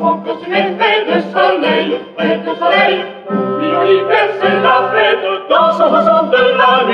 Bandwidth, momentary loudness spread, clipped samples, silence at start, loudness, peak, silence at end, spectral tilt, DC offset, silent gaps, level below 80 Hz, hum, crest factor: 9 kHz; 7 LU; under 0.1%; 0 s; -12 LUFS; 0 dBFS; 0 s; -6.5 dB/octave; under 0.1%; none; -60 dBFS; none; 12 dB